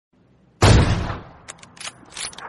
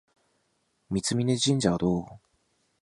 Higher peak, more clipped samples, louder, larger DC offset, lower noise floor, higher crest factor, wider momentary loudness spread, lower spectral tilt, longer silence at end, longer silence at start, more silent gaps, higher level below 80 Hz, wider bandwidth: first, -2 dBFS vs -8 dBFS; neither; first, -19 LUFS vs -26 LUFS; neither; second, -56 dBFS vs -73 dBFS; about the same, 18 dB vs 20 dB; first, 25 LU vs 9 LU; about the same, -5 dB/octave vs -5 dB/octave; second, 0 s vs 0.65 s; second, 0.6 s vs 0.9 s; neither; first, -28 dBFS vs -54 dBFS; about the same, 11.5 kHz vs 11.5 kHz